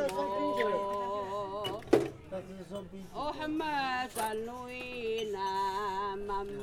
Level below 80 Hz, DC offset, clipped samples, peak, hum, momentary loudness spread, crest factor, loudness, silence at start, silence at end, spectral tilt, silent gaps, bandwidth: -58 dBFS; under 0.1%; under 0.1%; -10 dBFS; none; 13 LU; 24 dB; -35 LUFS; 0 s; 0 s; -4.5 dB/octave; none; 19 kHz